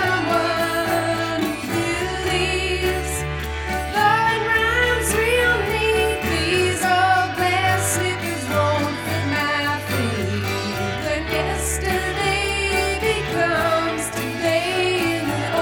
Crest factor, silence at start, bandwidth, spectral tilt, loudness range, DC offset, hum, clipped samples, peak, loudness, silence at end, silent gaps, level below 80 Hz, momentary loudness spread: 16 dB; 0 s; over 20 kHz; -4 dB/octave; 4 LU; under 0.1%; none; under 0.1%; -6 dBFS; -20 LUFS; 0 s; none; -36 dBFS; 6 LU